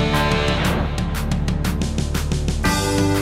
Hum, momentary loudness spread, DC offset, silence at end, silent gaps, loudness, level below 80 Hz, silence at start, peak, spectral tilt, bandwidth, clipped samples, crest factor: none; 5 LU; under 0.1%; 0 s; none; -21 LUFS; -26 dBFS; 0 s; -6 dBFS; -5 dB/octave; 16 kHz; under 0.1%; 14 dB